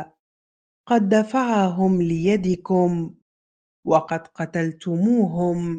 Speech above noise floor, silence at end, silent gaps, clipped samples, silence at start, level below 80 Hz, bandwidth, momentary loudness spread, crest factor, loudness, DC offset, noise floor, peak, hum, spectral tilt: over 70 dB; 0 s; 0.19-0.84 s, 3.22-3.83 s; under 0.1%; 0 s; -56 dBFS; 9 kHz; 9 LU; 18 dB; -21 LUFS; under 0.1%; under -90 dBFS; -4 dBFS; none; -7.5 dB/octave